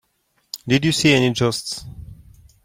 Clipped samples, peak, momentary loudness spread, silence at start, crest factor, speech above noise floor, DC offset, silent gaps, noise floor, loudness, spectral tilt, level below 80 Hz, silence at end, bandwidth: under 0.1%; -4 dBFS; 21 LU; 0.55 s; 18 dB; 48 dB; under 0.1%; none; -67 dBFS; -18 LUFS; -4.5 dB/octave; -48 dBFS; 0.5 s; 16.5 kHz